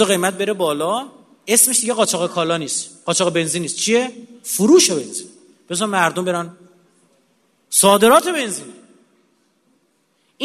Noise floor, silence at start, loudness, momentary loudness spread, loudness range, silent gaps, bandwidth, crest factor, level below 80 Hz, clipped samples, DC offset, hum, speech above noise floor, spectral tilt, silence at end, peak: -63 dBFS; 0 s; -16 LUFS; 15 LU; 2 LU; none; 13.5 kHz; 18 dB; -64 dBFS; under 0.1%; under 0.1%; none; 46 dB; -2.5 dB/octave; 0 s; 0 dBFS